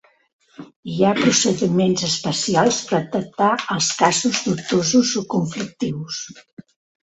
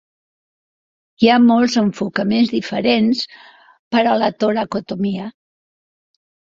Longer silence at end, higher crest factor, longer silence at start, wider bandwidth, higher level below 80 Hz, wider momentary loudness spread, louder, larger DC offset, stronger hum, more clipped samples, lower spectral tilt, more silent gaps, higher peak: second, 0.45 s vs 1.2 s; about the same, 18 dB vs 16 dB; second, 0.6 s vs 1.2 s; first, 8.4 kHz vs 7.6 kHz; about the same, -58 dBFS vs -58 dBFS; about the same, 11 LU vs 11 LU; about the same, -19 LUFS vs -17 LUFS; neither; neither; neither; second, -4 dB/octave vs -5.5 dB/octave; about the same, 0.76-0.83 s, 6.53-6.57 s vs 3.79-3.91 s; about the same, -2 dBFS vs -2 dBFS